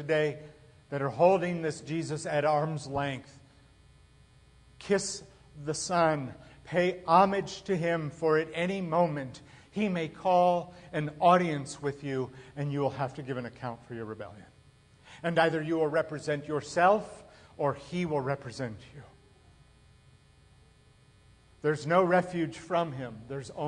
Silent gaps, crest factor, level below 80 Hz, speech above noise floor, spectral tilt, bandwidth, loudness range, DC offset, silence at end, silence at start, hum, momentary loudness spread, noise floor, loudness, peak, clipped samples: none; 20 dB; -64 dBFS; 31 dB; -5.5 dB/octave; 10.5 kHz; 8 LU; under 0.1%; 0 s; 0 s; none; 16 LU; -60 dBFS; -30 LUFS; -10 dBFS; under 0.1%